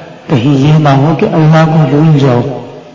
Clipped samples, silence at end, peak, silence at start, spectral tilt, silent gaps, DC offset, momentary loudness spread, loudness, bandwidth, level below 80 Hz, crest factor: 0.4%; 0.05 s; 0 dBFS; 0 s; -8.5 dB/octave; none; under 0.1%; 7 LU; -8 LUFS; 7.4 kHz; -42 dBFS; 8 dB